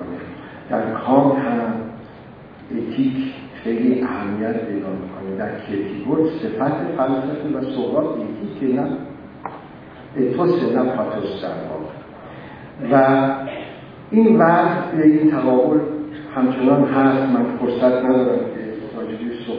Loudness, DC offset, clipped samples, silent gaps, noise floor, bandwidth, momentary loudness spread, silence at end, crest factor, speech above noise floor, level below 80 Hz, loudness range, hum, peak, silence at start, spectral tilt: -19 LUFS; under 0.1%; under 0.1%; none; -40 dBFS; 5.2 kHz; 19 LU; 0 s; 18 dB; 22 dB; -56 dBFS; 7 LU; none; -2 dBFS; 0 s; -10.5 dB/octave